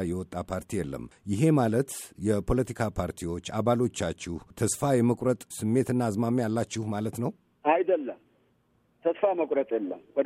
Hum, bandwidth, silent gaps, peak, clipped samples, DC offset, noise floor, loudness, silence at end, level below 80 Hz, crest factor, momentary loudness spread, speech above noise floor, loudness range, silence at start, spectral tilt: none; 15.5 kHz; none; -10 dBFS; under 0.1%; under 0.1%; -68 dBFS; -28 LUFS; 0 s; -48 dBFS; 18 dB; 10 LU; 41 dB; 2 LU; 0 s; -6.5 dB/octave